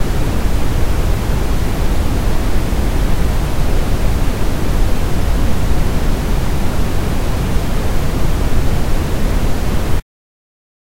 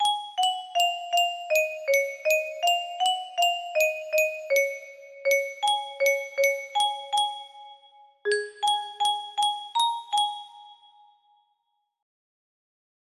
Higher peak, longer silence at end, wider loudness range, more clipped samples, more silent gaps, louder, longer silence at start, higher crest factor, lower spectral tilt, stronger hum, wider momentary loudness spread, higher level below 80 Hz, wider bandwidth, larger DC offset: first, -2 dBFS vs -10 dBFS; second, 1 s vs 2.25 s; second, 1 LU vs 4 LU; neither; neither; first, -19 LUFS vs -25 LUFS; about the same, 0 s vs 0 s; about the same, 12 dB vs 16 dB; first, -6 dB/octave vs 2 dB/octave; neither; second, 1 LU vs 5 LU; first, -16 dBFS vs -80 dBFS; about the same, 16 kHz vs 16 kHz; neither